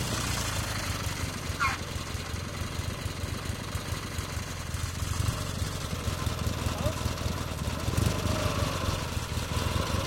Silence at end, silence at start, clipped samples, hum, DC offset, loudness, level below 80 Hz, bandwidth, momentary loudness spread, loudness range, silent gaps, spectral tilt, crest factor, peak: 0 s; 0 s; under 0.1%; none; under 0.1%; -32 LUFS; -40 dBFS; 17 kHz; 6 LU; 3 LU; none; -4 dB/octave; 18 dB; -14 dBFS